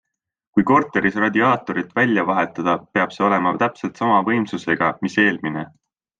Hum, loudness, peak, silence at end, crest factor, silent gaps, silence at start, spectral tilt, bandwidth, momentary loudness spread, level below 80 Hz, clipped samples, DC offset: none; -19 LUFS; -2 dBFS; 0.5 s; 18 dB; none; 0.55 s; -6.5 dB/octave; 7.8 kHz; 7 LU; -60 dBFS; under 0.1%; under 0.1%